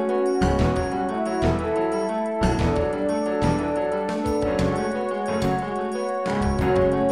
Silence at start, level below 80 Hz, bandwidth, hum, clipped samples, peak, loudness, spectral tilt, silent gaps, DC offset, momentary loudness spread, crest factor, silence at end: 0 s; -34 dBFS; 14 kHz; none; under 0.1%; -8 dBFS; -23 LUFS; -7 dB/octave; none; 0.2%; 5 LU; 14 dB; 0 s